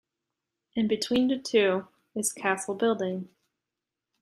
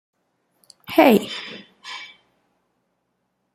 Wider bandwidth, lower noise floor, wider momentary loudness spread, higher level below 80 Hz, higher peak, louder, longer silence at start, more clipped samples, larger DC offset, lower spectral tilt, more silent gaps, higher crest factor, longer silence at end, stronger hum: about the same, 15 kHz vs 16 kHz; first, -88 dBFS vs -73 dBFS; second, 12 LU vs 23 LU; about the same, -70 dBFS vs -66 dBFS; second, -10 dBFS vs -2 dBFS; second, -27 LUFS vs -18 LUFS; second, 0.75 s vs 0.9 s; neither; neither; second, -3.5 dB/octave vs -5 dB/octave; neither; about the same, 20 dB vs 22 dB; second, 0.95 s vs 1.5 s; neither